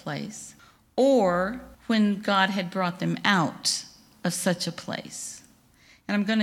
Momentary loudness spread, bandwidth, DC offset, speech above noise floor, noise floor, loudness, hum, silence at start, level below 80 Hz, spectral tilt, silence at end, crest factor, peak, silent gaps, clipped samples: 16 LU; 16 kHz; under 0.1%; 32 dB; -58 dBFS; -26 LUFS; none; 0.05 s; -62 dBFS; -4 dB/octave; 0 s; 22 dB; -6 dBFS; none; under 0.1%